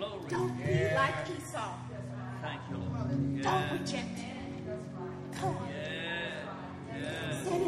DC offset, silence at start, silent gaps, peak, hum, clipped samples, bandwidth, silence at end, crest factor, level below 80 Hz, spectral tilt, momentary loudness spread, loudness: under 0.1%; 0 s; none; -16 dBFS; none; under 0.1%; 13.5 kHz; 0 s; 18 dB; -62 dBFS; -5.5 dB/octave; 11 LU; -35 LUFS